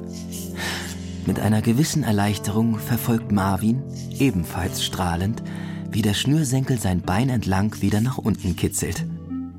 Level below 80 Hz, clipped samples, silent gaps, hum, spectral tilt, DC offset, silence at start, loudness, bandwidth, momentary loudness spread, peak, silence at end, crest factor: -44 dBFS; under 0.1%; none; none; -5.5 dB/octave; under 0.1%; 0 s; -23 LUFS; 16.5 kHz; 10 LU; -8 dBFS; 0 s; 14 dB